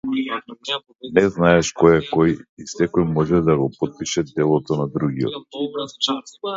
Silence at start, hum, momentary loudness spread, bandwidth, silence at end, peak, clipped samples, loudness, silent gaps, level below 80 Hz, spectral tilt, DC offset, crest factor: 0.05 s; none; 11 LU; 7.8 kHz; 0 s; 0 dBFS; under 0.1%; -20 LUFS; 2.49-2.57 s; -46 dBFS; -5.5 dB/octave; under 0.1%; 20 dB